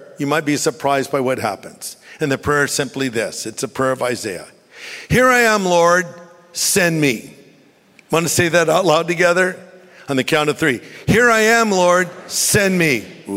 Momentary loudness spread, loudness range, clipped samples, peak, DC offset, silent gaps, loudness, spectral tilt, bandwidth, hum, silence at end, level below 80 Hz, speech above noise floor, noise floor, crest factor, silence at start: 14 LU; 5 LU; under 0.1%; -2 dBFS; under 0.1%; none; -16 LUFS; -3.5 dB/octave; 16 kHz; none; 0 s; -48 dBFS; 34 dB; -51 dBFS; 16 dB; 0 s